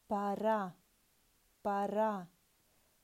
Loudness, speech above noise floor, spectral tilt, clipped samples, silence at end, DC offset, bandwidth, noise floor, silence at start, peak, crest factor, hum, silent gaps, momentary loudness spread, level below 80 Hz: -36 LUFS; 38 dB; -7 dB/octave; under 0.1%; 0.75 s; under 0.1%; 16 kHz; -73 dBFS; 0.1 s; -22 dBFS; 16 dB; none; none; 11 LU; -76 dBFS